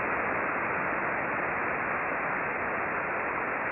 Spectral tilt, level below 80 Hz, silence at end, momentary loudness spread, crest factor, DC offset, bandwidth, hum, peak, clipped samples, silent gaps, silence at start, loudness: -9.5 dB/octave; -60 dBFS; 0 s; 1 LU; 12 dB; under 0.1%; 4 kHz; none; -18 dBFS; under 0.1%; none; 0 s; -29 LUFS